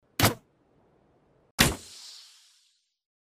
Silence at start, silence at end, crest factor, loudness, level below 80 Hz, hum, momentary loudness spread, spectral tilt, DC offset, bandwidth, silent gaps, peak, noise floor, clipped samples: 0.2 s; 1.25 s; 32 dB; -26 LUFS; -46 dBFS; none; 21 LU; -3 dB/octave; under 0.1%; 16 kHz; 1.51-1.58 s; -2 dBFS; -69 dBFS; under 0.1%